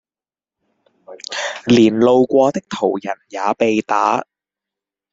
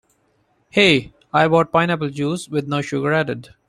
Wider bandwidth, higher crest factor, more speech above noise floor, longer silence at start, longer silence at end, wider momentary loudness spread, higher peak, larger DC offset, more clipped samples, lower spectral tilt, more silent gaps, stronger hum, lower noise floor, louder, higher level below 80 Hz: second, 7.8 kHz vs 13 kHz; about the same, 16 dB vs 20 dB; first, over 75 dB vs 45 dB; first, 1.1 s vs 0.75 s; first, 0.9 s vs 0.25 s; first, 12 LU vs 9 LU; about the same, -2 dBFS vs 0 dBFS; neither; neither; about the same, -5.5 dB/octave vs -5.5 dB/octave; neither; neither; first, under -90 dBFS vs -63 dBFS; first, -16 LUFS vs -19 LUFS; about the same, -58 dBFS vs -54 dBFS